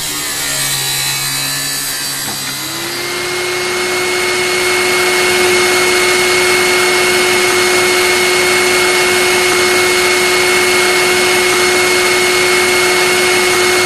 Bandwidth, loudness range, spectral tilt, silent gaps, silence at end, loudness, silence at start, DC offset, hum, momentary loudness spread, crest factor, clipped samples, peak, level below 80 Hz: 15.5 kHz; 5 LU; -1.5 dB/octave; none; 0 s; -11 LUFS; 0 s; under 0.1%; none; 6 LU; 12 dB; under 0.1%; 0 dBFS; -46 dBFS